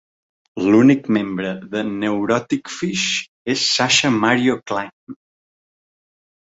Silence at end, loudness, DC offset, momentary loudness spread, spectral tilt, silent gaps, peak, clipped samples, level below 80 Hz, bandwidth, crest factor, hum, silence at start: 1.35 s; -18 LUFS; under 0.1%; 12 LU; -4 dB/octave; 3.28-3.45 s, 4.93-5.07 s; -2 dBFS; under 0.1%; -60 dBFS; 8 kHz; 18 dB; none; 0.55 s